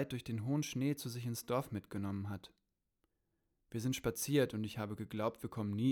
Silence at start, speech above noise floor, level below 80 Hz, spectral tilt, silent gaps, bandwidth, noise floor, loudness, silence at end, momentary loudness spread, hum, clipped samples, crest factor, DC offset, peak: 0 s; 46 dB; -68 dBFS; -5.5 dB/octave; none; over 20 kHz; -84 dBFS; -39 LUFS; 0 s; 9 LU; none; under 0.1%; 20 dB; under 0.1%; -20 dBFS